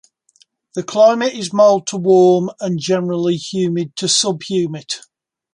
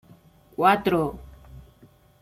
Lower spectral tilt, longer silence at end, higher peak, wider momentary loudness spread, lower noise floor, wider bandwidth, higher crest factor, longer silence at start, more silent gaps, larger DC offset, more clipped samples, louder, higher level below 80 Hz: second, -4.5 dB/octave vs -6.5 dB/octave; about the same, 0.55 s vs 0.6 s; first, 0 dBFS vs -6 dBFS; second, 12 LU vs 21 LU; about the same, -56 dBFS vs -55 dBFS; second, 11.5 kHz vs 16 kHz; about the same, 16 dB vs 20 dB; first, 0.75 s vs 0.6 s; neither; neither; neither; first, -16 LUFS vs -22 LUFS; second, -64 dBFS vs -50 dBFS